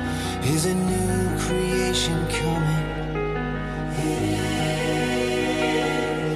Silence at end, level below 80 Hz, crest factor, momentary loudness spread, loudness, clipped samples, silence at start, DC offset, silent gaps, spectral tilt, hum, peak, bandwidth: 0 s; -36 dBFS; 14 dB; 5 LU; -24 LUFS; under 0.1%; 0 s; under 0.1%; none; -5 dB/octave; none; -10 dBFS; 14 kHz